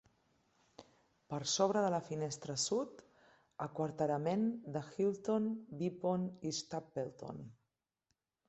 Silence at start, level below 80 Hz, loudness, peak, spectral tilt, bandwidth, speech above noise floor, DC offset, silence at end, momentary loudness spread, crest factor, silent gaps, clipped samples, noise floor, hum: 0.8 s; -78 dBFS; -38 LUFS; -18 dBFS; -5 dB/octave; 8.2 kHz; 49 dB; under 0.1%; 0.95 s; 12 LU; 20 dB; none; under 0.1%; -87 dBFS; none